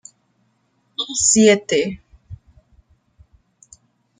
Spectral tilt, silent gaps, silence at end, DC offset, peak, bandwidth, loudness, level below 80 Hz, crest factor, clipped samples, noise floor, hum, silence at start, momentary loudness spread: -2.5 dB/octave; none; 1.85 s; under 0.1%; -2 dBFS; 9.6 kHz; -16 LUFS; -54 dBFS; 20 dB; under 0.1%; -65 dBFS; none; 1 s; 18 LU